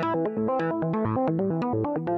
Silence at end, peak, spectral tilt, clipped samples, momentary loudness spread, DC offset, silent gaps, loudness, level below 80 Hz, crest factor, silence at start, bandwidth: 0 s; -14 dBFS; -10 dB/octave; under 0.1%; 1 LU; under 0.1%; none; -26 LUFS; -60 dBFS; 12 dB; 0 s; 6.2 kHz